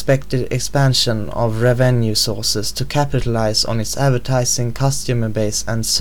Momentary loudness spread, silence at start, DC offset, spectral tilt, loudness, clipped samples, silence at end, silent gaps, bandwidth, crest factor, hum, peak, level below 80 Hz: 5 LU; 0 s; 5%; -4.5 dB/octave; -17 LUFS; under 0.1%; 0 s; none; 18.5 kHz; 14 dB; none; -2 dBFS; -36 dBFS